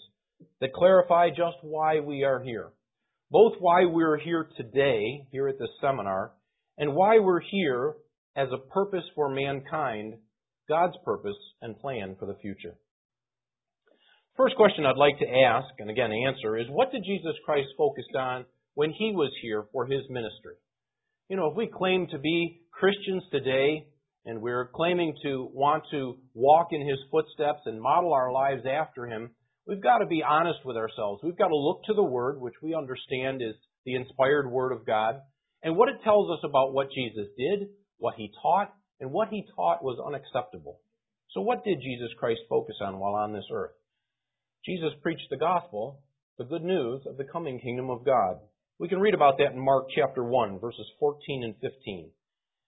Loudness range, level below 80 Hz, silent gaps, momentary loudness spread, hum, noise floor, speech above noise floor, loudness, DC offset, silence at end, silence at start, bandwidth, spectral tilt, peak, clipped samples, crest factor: 7 LU; -66 dBFS; 8.18-8.34 s, 12.91-13.09 s, 33.78-33.84 s, 46.23-46.37 s; 15 LU; none; under -90 dBFS; over 63 dB; -27 LUFS; under 0.1%; 0.6 s; 0.6 s; 4 kHz; -10 dB/octave; -6 dBFS; under 0.1%; 22 dB